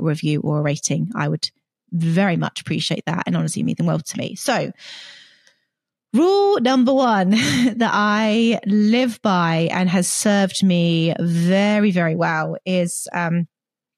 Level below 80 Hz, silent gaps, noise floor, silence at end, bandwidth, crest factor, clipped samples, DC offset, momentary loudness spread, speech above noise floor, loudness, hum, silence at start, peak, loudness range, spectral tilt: -64 dBFS; none; -78 dBFS; 0.5 s; 13.5 kHz; 14 dB; under 0.1%; under 0.1%; 8 LU; 60 dB; -19 LUFS; none; 0 s; -6 dBFS; 6 LU; -5 dB/octave